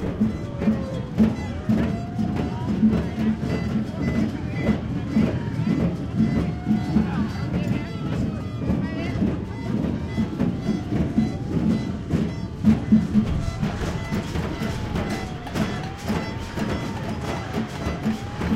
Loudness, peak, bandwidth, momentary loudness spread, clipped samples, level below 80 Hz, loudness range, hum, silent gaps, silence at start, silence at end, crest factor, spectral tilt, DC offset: -25 LUFS; -4 dBFS; 13 kHz; 6 LU; under 0.1%; -36 dBFS; 5 LU; none; none; 0 s; 0 s; 20 dB; -7.5 dB/octave; under 0.1%